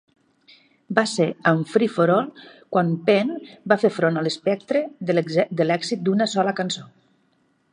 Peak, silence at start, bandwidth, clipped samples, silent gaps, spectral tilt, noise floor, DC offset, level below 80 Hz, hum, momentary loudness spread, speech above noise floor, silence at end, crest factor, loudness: 0 dBFS; 0.9 s; 10.5 kHz; under 0.1%; none; -5.5 dB/octave; -65 dBFS; under 0.1%; -72 dBFS; none; 6 LU; 44 dB; 0.9 s; 22 dB; -22 LUFS